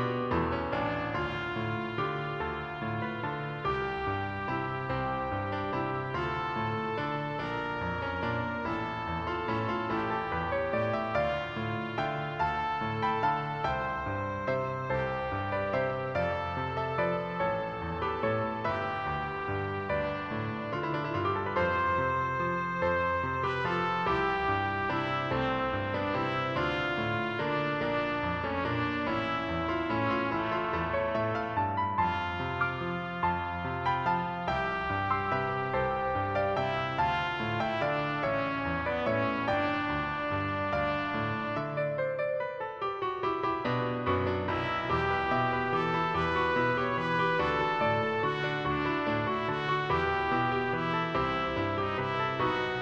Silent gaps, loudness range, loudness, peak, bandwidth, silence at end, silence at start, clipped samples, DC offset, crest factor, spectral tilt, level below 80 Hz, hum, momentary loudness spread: none; 4 LU; -31 LUFS; -16 dBFS; 8.4 kHz; 0 s; 0 s; under 0.1%; under 0.1%; 16 dB; -7 dB/octave; -54 dBFS; none; 5 LU